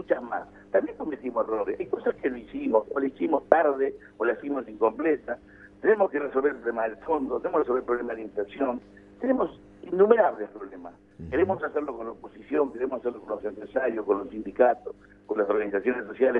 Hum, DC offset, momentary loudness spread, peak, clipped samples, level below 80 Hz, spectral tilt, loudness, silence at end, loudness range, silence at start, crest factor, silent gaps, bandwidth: 50 Hz at -60 dBFS; under 0.1%; 13 LU; 0 dBFS; under 0.1%; -60 dBFS; -8.5 dB/octave; -27 LUFS; 0 s; 3 LU; 0 s; 26 dB; none; 3.8 kHz